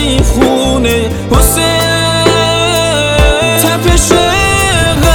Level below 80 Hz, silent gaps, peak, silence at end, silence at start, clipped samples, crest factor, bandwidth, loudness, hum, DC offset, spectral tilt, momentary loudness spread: -16 dBFS; none; 0 dBFS; 0 s; 0 s; 1%; 8 dB; over 20 kHz; -9 LUFS; none; under 0.1%; -4 dB/octave; 2 LU